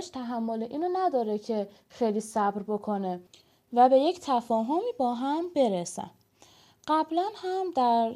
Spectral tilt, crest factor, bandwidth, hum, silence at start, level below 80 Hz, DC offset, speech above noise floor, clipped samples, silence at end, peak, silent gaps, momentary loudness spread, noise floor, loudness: -5.5 dB/octave; 18 dB; 14.5 kHz; none; 0 s; -74 dBFS; under 0.1%; 31 dB; under 0.1%; 0 s; -10 dBFS; none; 11 LU; -59 dBFS; -28 LUFS